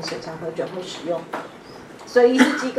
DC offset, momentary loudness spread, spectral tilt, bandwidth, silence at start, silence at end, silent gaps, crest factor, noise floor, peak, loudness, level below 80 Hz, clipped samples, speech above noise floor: under 0.1%; 23 LU; -4 dB/octave; 13.5 kHz; 0 s; 0 s; none; 20 dB; -40 dBFS; -2 dBFS; -21 LUFS; -62 dBFS; under 0.1%; 20 dB